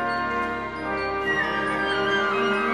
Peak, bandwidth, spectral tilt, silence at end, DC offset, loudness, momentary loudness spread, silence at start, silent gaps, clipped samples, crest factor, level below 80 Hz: -12 dBFS; 12 kHz; -4.5 dB/octave; 0 s; 0.2%; -24 LUFS; 6 LU; 0 s; none; under 0.1%; 14 dB; -50 dBFS